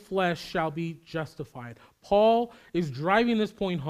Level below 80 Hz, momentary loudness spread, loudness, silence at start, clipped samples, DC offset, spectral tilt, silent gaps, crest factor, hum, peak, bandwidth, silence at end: -56 dBFS; 17 LU; -27 LUFS; 0.1 s; under 0.1%; under 0.1%; -6.5 dB/octave; none; 20 dB; none; -8 dBFS; 15 kHz; 0 s